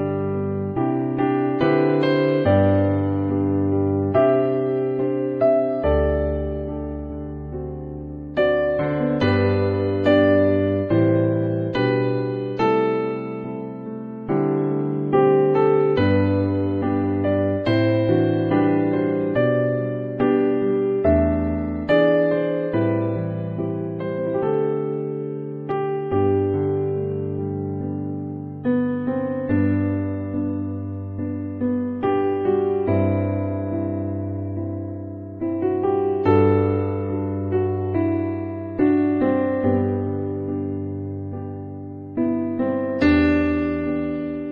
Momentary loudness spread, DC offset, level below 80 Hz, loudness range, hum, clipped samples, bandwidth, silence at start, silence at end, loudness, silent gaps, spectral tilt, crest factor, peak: 11 LU; under 0.1%; -42 dBFS; 5 LU; none; under 0.1%; 5.2 kHz; 0 s; 0 s; -21 LUFS; none; -10 dB/octave; 16 dB; -4 dBFS